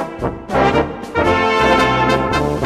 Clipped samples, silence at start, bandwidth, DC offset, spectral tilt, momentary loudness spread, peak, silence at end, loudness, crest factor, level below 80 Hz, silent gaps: under 0.1%; 0 s; 15 kHz; under 0.1%; -5.5 dB/octave; 8 LU; 0 dBFS; 0 s; -15 LUFS; 14 dB; -32 dBFS; none